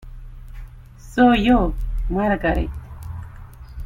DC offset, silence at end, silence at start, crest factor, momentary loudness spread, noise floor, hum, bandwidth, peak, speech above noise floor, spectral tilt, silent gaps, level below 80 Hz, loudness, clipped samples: under 0.1%; 0 s; 0 s; 18 dB; 26 LU; -40 dBFS; none; 14 kHz; -2 dBFS; 23 dB; -7 dB/octave; none; -28 dBFS; -19 LUFS; under 0.1%